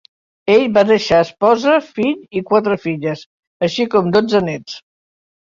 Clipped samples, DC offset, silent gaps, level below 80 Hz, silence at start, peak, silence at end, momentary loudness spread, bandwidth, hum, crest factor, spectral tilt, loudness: under 0.1%; under 0.1%; 3.26-3.60 s; -52 dBFS; 0.45 s; -2 dBFS; 0.65 s; 12 LU; 7.6 kHz; none; 16 dB; -6 dB/octave; -15 LUFS